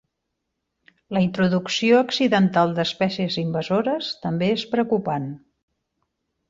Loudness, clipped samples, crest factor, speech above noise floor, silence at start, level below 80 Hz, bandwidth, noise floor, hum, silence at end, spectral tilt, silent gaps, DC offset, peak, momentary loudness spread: -22 LUFS; under 0.1%; 18 dB; 58 dB; 1.1 s; -62 dBFS; 7.6 kHz; -79 dBFS; none; 1.15 s; -6 dB/octave; none; under 0.1%; -6 dBFS; 9 LU